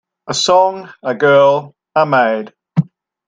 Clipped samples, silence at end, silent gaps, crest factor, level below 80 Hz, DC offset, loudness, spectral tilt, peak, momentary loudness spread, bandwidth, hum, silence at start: under 0.1%; 0.45 s; none; 14 dB; -64 dBFS; under 0.1%; -14 LUFS; -4.5 dB/octave; 0 dBFS; 13 LU; 9.4 kHz; none; 0.25 s